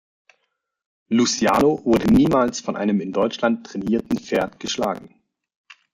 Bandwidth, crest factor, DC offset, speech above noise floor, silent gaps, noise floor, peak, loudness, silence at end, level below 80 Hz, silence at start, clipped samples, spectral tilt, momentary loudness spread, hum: 16 kHz; 16 dB; under 0.1%; 55 dB; none; -75 dBFS; -6 dBFS; -20 LUFS; 0.85 s; -48 dBFS; 1.1 s; under 0.1%; -5 dB/octave; 9 LU; none